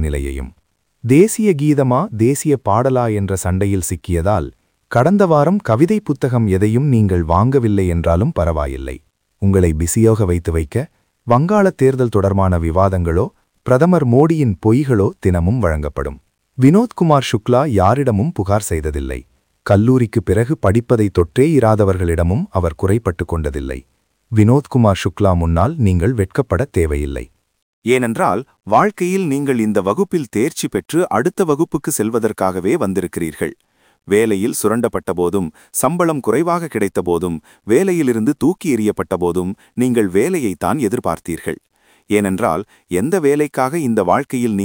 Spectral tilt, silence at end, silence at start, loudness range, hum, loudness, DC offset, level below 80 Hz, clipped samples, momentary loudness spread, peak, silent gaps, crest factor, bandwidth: -7 dB/octave; 0 s; 0 s; 3 LU; none; -16 LUFS; under 0.1%; -36 dBFS; under 0.1%; 10 LU; 0 dBFS; 27.62-27.82 s; 16 dB; 17 kHz